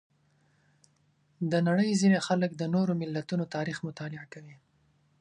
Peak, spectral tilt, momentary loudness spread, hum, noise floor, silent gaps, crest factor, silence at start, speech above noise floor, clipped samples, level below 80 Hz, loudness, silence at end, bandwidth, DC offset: -12 dBFS; -6 dB/octave; 16 LU; none; -69 dBFS; none; 18 dB; 1.4 s; 40 dB; under 0.1%; -72 dBFS; -29 LUFS; 0.65 s; 10 kHz; under 0.1%